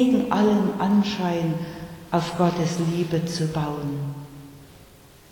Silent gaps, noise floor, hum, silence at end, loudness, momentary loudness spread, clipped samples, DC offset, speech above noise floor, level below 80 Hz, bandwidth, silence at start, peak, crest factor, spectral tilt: none; -49 dBFS; none; 0.45 s; -24 LUFS; 14 LU; under 0.1%; under 0.1%; 27 dB; -54 dBFS; 18.5 kHz; 0 s; -6 dBFS; 18 dB; -6.5 dB/octave